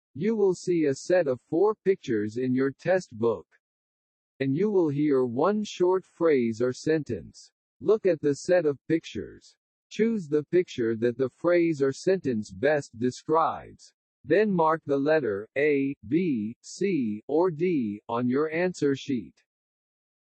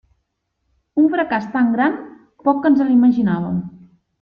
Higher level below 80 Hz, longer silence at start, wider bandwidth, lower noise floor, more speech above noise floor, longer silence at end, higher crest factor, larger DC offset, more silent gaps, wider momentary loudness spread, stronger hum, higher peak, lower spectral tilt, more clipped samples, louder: second, -68 dBFS vs -58 dBFS; second, 0.15 s vs 0.95 s; first, 8.4 kHz vs 5.2 kHz; first, under -90 dBFS vs -72 dBFS; first, over 64 dB vs 56 dB; first, 0.95 s vs 0.45 s; about the same, 16 dB vs 14 dB; neither; first, 3.59-4.39 s, 7.52-7.80 s, 8.81-8.85 s, 9.57-9.90 s, 13.94-14.24 s, 15.97-16.01 s, 16.56-16.61 s, 17.23-17.28 s vs none; second, 7 LU vs 11 LU; neither; second, -10 dBFS vs -4 dBFS; second, -6.5 dB/octave vs -9 dB/octave; neither; second, -26 LUFS vs -17 LUFS